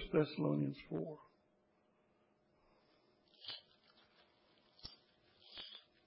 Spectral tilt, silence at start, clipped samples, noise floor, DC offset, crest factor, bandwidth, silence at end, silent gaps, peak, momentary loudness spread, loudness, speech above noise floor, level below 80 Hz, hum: -6 dB/octave; 0 s; under 0.1%; -76 dBFS; under 0.1%; 24 dB; 5.6 kHz; 0.25 s; none; -22 dBFS; 19 LU; -42 LUFS; 38 dB; -68 dBFS; none